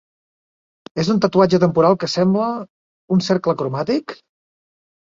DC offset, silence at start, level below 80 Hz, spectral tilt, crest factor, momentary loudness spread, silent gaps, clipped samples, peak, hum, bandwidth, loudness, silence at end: under 0.1%; 0.95 s; -56 dBFS; -6.5 dB/octave; 18 dB; 9 LU; 2.70-3.08 s; under 0.1%; -2 dBFS; none; 7.6 kHz; -18 LUFS; 0.9 s